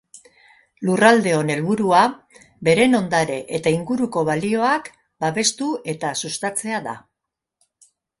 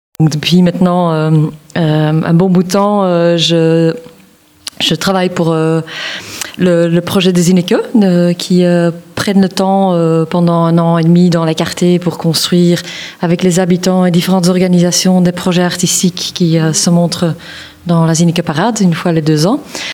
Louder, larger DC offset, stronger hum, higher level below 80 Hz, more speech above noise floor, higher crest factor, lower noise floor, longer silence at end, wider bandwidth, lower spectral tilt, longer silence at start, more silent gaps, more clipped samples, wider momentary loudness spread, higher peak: second, -20 LUFS vs -11 LUFS; neither; neither; second, -60 dBFS vs -50 dBFS; first, 63 dB vs 34 dB; first, 20 dB vs 10 dB; first, -83 dBFS vs -44 dBFS; first, 1.2 s vs 0 s; second, 11.5 kHz vs 16.5 kHz; about the same, -4.5 dB/octave vs -5.5 dB/octave; about the same, 0.15 s vs 0.2 s; neither; neither; first, 10 LU vs 7 LU; about the same, 0 dBFS vs 0 dBFS